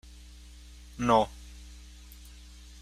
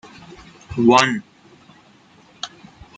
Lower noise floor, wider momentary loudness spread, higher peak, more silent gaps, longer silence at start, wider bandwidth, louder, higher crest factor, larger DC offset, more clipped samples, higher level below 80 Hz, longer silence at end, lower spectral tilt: about the same, -49 dBFS vs -51 dBFS; about the same, 26 LU vs 25 LU; second, -10 dBFS vs 0 dBFS; neither; first, 0.95 s vs 0.7 s; first, 15.5 kHz vs 9.4 kHz; second, -27 LUFS vs -17 LUFS; about the same, 24 dB vs 22 dB; neither; neither; about the same, -48 dBFS vs -52 dBFS; about the same, 0.5 s vs 0.5 s; first, -5.5 dB/octave vs -4 dB/octave